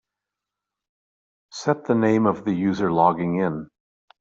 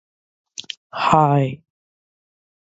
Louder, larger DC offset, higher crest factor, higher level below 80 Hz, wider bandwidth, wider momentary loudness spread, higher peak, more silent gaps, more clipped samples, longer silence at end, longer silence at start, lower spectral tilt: second, -22 LUFS vs -18 LUFS; neither; about the same, 20 dB vs 22 dB; about the same, -62 dBFS vs -58 dBFS; about the same, 7.8 kHz vs 8 kHz; second, 9 LU vs 21 LU; second, -4 dBFS vs 0 dBFS; second, none vs 0.77-0.90 s; neither; second, 0.55 s vs 1.05 s; first, 1.55 s vs 0.6 s; about the same, -6.5 dB/octave vs -6.5 dB/octave